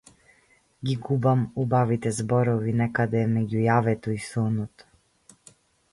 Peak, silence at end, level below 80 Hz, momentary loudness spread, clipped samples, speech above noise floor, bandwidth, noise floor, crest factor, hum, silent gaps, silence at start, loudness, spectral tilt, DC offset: -10 dBFS; 1.25 s; -58 dBFS; 8 LU; under 0.1%; 38 dB; 11.5 kHz; -62 dBFS; 16 dB; none; none; 0.8 s; -25 LUFS; -7.5 dB/octave; under 0.1%